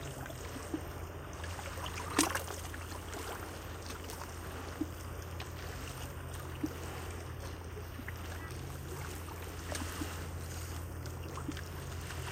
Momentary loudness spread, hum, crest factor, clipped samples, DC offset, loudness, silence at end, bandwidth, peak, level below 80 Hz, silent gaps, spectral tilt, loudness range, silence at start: 5 LU; none; 28 dB; under 0.1%; under 0.1%; -41 LUFS; 0 s; 16.5 kHz; -12 dBFS; -50 dBFS; none; -4 dB/octave; 5 LU; 0 s